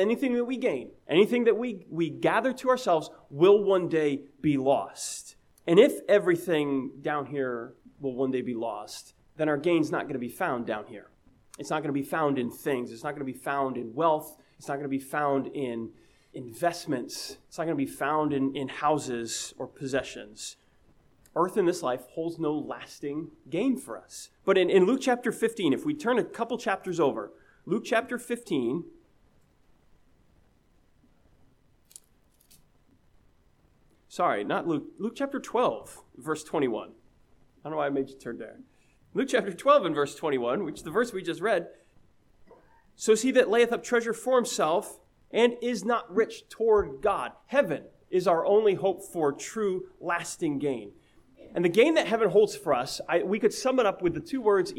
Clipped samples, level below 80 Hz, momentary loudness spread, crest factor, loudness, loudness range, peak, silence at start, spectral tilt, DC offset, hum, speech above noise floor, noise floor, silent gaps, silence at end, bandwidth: under 0.1%; -64 dBFS; 15 LU; 22 dB; -28 LUFS; 7 LU; -6 dBFS; 0 s; -5 dB/octave; under 0.1%; none; 36 dB; -63 dBFS; none; 0 s; 16 kHz